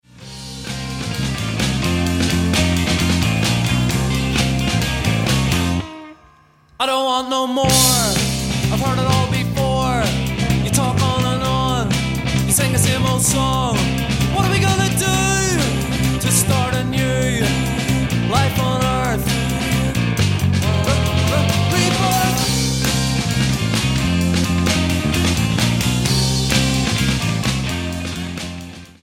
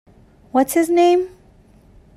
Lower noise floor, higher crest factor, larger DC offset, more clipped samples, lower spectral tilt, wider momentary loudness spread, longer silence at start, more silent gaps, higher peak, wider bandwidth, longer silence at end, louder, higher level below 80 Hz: about the same, -51 dBFS vs -50 dBFS; about the same, 16 dB vs 14 dB; neither; neither; about the same, -4.5 dB/octave vs -4 dB/octave; about the same, 6 LU vs 8 LU; second, 0.15 s vs 0.55 s; neither; about the same, -2 dBFS vs -4 dBFS; first, 17 kHz vs 15 kHz; second, 0.15 s vs 0.9 s; about the same, -17 LUFS vs -17 LUFS; first, -30 dBFS vs -54 dBFS